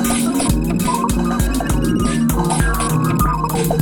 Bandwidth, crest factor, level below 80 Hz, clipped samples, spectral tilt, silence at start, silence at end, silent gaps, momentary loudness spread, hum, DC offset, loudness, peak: 19.5 kHz; 14 dB; -24 dBFS; under 0.1%; -5.5 dB/octave; 0 s; 0 s; none; 1 LU; none; under 0.1%; -17 LUFS; -2 dBFS